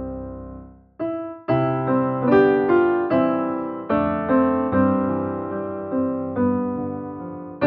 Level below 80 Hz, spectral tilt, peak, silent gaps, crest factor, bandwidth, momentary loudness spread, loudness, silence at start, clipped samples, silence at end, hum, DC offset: -50 dBFS; -7.5 dB/octave; -4 dBFS; none; 18 dB; 4.7 kHz; 15 LU; -21 LUFS; 0 s; under 0.1%; 0 s; none; under 0.1%